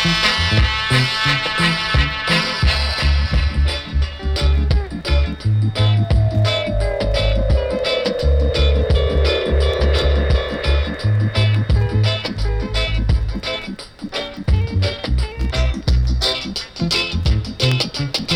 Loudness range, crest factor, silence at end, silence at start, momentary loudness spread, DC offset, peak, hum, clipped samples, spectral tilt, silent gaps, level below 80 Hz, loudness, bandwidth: 4 LU; 14 dB; 0 s; 0 s; 6 LU; under 0.1%; -2 dBFS; none; under 0.1%; -5.5 dB/octave; none; -20 dBFS; -18 LUFS; 11 kHz